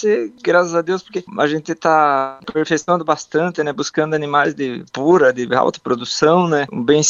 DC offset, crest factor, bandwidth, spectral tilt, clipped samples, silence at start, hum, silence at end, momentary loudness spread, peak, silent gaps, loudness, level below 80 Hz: under 0.1%; 16 dB; 7.6 kHz; -4.5 dB/octave; under 0.1%; 0 s; none; 0 s; 9 LU; 0 dBFS; none; -17 LUFS; -60 dBFS